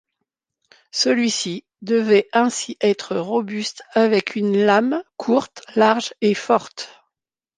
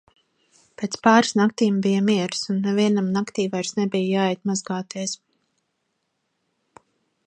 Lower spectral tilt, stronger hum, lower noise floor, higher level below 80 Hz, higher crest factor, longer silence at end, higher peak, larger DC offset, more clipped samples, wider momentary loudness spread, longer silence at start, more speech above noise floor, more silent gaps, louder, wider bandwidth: about the same, -4 dB/octave vs -5 dB/octave; neither; first, -82 dBFS vs -75 dBFS; about the same, -70 dBFS vs -70 dBFS; about the same, 18 dB vs 22 dB; second, 0.7 s vs 2.1 s; about the same, -2 dBFS vs -2 dBFS; neither; neither; about the same, 10 LU vs 12 LU; first, 0.95 s vs 0.8 s; first, 63 dB vs 53 dB; neither; first, -19 LUFS vs -22 LUFS; about the same, 10 kHz vs 9.4 kHz